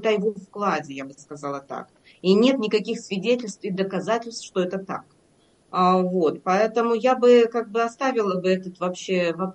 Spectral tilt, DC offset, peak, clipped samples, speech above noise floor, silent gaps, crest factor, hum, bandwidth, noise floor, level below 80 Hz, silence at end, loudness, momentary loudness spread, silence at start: -5.5 dB/octave; under 0.1%; -6 dBFS; under 0.1%; 38 dB; none; 18 dB; none; 8.8 kHz; -60 dBFS; -72 dBFS; 0 s; -23 LUFS; 14 LU; 0 s